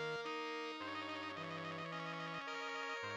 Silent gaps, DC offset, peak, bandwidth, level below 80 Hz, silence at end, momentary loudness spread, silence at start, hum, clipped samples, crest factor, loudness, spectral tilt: none; under 0.1%; -32 dBFS; 18.5 kHz; under -90 dBFS; 0 s; 2 LU; 0 s; none; under 0.1%; 12 dB; -44 LUFS; -4 dB/octave